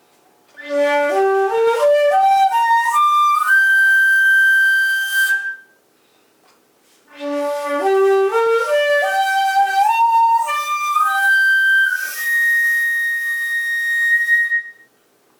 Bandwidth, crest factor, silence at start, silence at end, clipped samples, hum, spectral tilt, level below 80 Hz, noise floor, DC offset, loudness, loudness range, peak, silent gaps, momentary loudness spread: over 20 kHz; 10 dB; 0.6 s; 0.7 s; under 0.1%; none; 0 dB/octave; -74 dBFS; -57 dBFS; under 0.1%; -15 LUFS; 7 LU; -6 dBFS; none; 8 LU